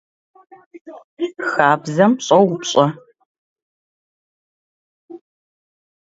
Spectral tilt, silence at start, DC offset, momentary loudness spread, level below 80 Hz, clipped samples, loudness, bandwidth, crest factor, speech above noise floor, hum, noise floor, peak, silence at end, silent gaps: -5 dB/octave; 0.75 s; under 0.1%; 13 LU; -68 dBFS; under 0.1%; -16 LUFS; 8 kHz; 20 dB; over 73 dB; none; under -90 dBFS; 0 dBFS; 0.85 s; 0.81-0.85 s, 1.04-1.17 s, 3.25-3.56 s, 3.62-5.08 s